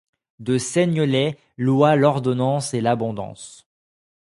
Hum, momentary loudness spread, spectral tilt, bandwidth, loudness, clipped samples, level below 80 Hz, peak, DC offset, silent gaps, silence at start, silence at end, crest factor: none; 16 LU; -6 dB/octave; 11.5 kHz; -20 LUFS; under 0.1%; -60 dBFS; -2 dBFS; under 0.1%; none; 0.4 s; 0.85 s; 20 dB